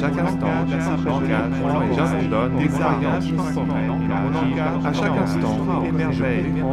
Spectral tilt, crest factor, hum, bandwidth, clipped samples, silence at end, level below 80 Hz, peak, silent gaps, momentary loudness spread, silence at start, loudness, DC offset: -7.5 dB/octave; 14 dB; none; 11.5 kHz; under 0.1%; 0 s; -40 dBFS; -6 dBFS; none; 2 LU; 0 s; -21 LUFS; under 0.1%